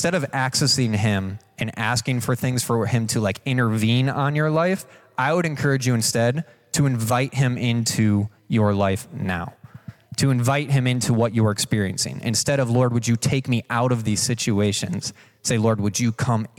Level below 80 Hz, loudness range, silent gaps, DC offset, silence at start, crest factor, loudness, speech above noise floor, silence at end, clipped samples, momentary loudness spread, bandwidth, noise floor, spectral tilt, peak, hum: -56 dBFS; 1 LU; none; under 0.1%; 0 s; 14 dB; -22 LUFS; 21 dB; 0.1 s; under 0.1%; 7 LU; 17 kHz; -42 dBFS; -5 dB/octave; -8 dBFS; none